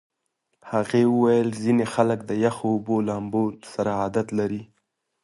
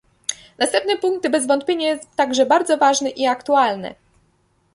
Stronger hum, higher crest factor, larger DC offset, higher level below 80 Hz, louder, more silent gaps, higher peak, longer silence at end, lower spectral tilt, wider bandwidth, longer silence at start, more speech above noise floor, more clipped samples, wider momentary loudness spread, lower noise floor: neither; about the same, 20 dB vs 18 dB; neither; about the same, -60 dBFS vs -64 dBFS; second, -23 LUFS vs -19 LUFS; neither; about the same, -4 dBFS vs -2 dBFS; second, 0.6 s vs 0.8 s; first, -7 dB/octave vs -2 dB/octave; about the same, 11.5 kHz vs 11.5 kHz; first, 0.65 s vs 0.3 s; first, 53 dB vs 44 dB; neither; second, 8 LU vs 12 LU; first, -76 dBFS vs -62 dBFS